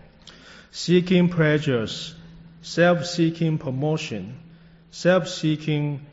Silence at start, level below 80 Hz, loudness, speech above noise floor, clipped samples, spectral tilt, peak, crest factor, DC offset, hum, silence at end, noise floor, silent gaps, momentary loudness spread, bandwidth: 0.25 s; -56 dBFS; -22 LUFS; 26 dB; under 0.1%; -5.5 dB/octave; -8 dBFS; 16 dB; under 0.1%; none; 0.05 s; -47 dBFS; none; 16 LU; 8 kHz